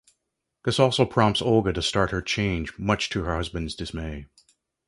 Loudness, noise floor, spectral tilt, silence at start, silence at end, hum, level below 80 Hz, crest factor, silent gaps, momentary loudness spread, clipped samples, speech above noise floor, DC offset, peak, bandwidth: -24 LUFS; -81 dBFS; -5 dB/octave; 0.65 s; 0.65 s; none; -42 dBFS; 22 dB; none; 12 LU; under 0.1%; 56 dB; under 0.1%; -4 dBFS; 11.5 kHz